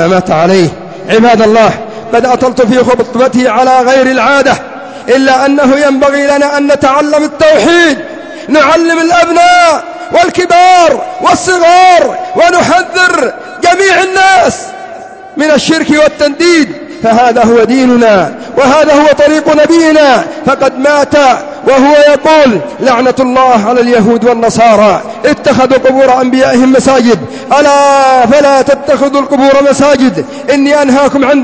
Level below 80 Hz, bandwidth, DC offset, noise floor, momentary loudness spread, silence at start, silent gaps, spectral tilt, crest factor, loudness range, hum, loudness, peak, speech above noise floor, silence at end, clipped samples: -42 dBFS; 8 kHz; 0.6%; -26 dBFS; 7 LU; 0 s; none; -4.5 dB/octave; 6 dB; 2 LU; none; -6 LUFS; 0 dBFS; 20 dB; 0 s; 2%